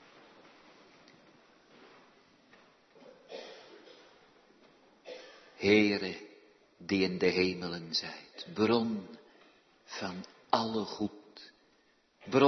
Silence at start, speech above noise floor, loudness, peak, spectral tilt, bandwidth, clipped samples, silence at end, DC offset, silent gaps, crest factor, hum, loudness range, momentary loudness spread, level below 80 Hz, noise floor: 3.05 s; 38 dB; -32 LUFS; -10 dBFS; -5.5 dB/octave; 6.4 kHz; under 0.1%; 0 s; under 0.1%; none; 24 dB; none; 23 LU; 25 LU; -74 dBFS; -69 dBFS